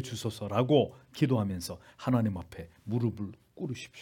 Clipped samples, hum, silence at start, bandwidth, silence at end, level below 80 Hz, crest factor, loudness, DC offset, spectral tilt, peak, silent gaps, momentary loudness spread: under 0.1%; none; 0 s; 17.5 kHz; 0 s; -64 dBFS; 20 dB; -31 LUFS; under 0.1%; -7 dB/octave; -12 dBFS; none; 15 LU